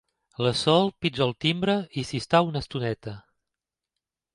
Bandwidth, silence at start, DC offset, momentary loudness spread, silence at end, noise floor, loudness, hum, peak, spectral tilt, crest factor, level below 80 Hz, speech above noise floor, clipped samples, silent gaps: 11.5 kHz; 0.4 s; under 0.1%; 14 LU; 1.15 s; -88 dBFS; -25 LUFS; none; -6 dBFS; -5.5 dB/octave; 22 dB; -56 dBFS; 63 dB; under 0.1%; none